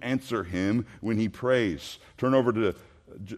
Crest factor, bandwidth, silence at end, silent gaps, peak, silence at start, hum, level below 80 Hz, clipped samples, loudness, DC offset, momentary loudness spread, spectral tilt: 16 dB; 14 kHz; 0 s; none; -10 dBFS; 0 s; none; -58 dBFS; under 0.1%; -27 LUFS; under 0.1%; 14 LU; -6.5 dB/octave